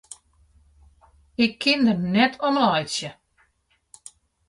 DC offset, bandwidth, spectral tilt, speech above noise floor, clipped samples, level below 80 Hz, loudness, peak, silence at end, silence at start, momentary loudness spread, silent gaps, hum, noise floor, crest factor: under 0.1%; 11.5 kHz; -4.5 dB/octave; 47 dB; under 0.1%; -60 dBFS; -21 LUFS; -6 dBFS; 1.35 s; 1.4 s; 17 LU; none; none; -68 dBFS; 18 dB